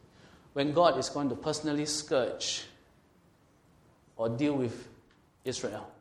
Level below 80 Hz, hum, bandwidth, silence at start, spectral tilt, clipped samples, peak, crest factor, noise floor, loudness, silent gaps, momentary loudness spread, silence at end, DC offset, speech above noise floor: -66 dBFS; none; 14 kHz; 0.55 s; -4 dB/octave; under 0.1%; -8 dBFS; 24 dB; -64 dBFS; -31 LUFS; none; 14 LU; 0.1 s; under 0.1%; 33 dB